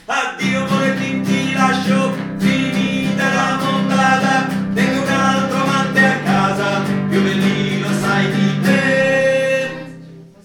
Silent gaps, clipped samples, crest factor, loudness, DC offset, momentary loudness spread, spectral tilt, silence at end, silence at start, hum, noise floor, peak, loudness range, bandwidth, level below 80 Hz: none; under 0.1%; 16 dB; -16 LUFS; under 0.1%; 5 LU; -5.5 dB/octave; 0.2 s; 0.1 s; none; -38 dBFS; 0 dBFS; 1 LU; 16 kHz; -54 dBFS